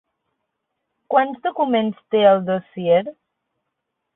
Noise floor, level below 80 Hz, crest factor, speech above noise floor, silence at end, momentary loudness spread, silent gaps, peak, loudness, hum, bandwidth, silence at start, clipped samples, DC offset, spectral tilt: -78 dBFS; -68 dBFS; 20 dB; 60 dB; 1.05 s; 8 LU; none; -2 dBFS; -19 LUFS; none; 4 kHz; 1.1 s; under 0.1%; under 0.1%; -10.5 dB/octave